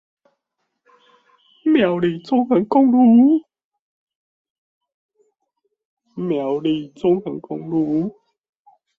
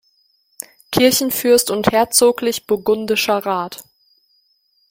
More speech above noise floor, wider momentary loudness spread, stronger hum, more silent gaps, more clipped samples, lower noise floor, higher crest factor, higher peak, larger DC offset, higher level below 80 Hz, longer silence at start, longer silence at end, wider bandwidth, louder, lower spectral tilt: first, 59 dB vs 46 dB; second, 15 LU vs 19 LU; neither; first, 3.64-3.71 s, 3.79-4.07 s, 4.15-4.81 s, 4.94-5.09 s, 5.85-5.97 s vs none; neither; first, -76 dBFS vs -62 dBFS; about the same, 16 dB vs 18 dB; second, -4 dBFS vs 0 dBFS; neither; second, -64 dBFS vs -54 dBFS; first, 1.65 s vs 0.9 s; second, 0.9 s vs 1.1 s; second, 5.2 kHz vs 17 kHz; about the same, -18 LUFS vs -16 LUFS; first, -9 dB/octave vs -3 dB/octave